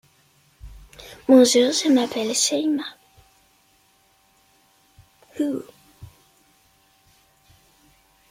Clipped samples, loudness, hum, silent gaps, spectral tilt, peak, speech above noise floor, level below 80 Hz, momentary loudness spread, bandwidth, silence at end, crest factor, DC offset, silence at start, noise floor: under 0.1%; -19 LUFS; none; none; -2.5 dB/octave; -2 dBFS; 42 dB; -56 dBFS; 24 LU; 16 kHz; 2.25 s; 22 dB; under 0.1%; 0.65 s; -61 dBFS